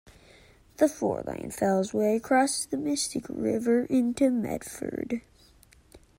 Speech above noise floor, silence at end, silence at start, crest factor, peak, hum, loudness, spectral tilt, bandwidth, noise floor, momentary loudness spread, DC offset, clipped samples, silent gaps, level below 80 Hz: 31 dB; 0.2 s; 0.05 s; 18 dB; -10 dBFS; none; -27 LUFS; -4.5 dB/octave; 16 kHz; -58 dBFS; 10 LU; under 0.1%; under 0.1%; none; -60 dBFS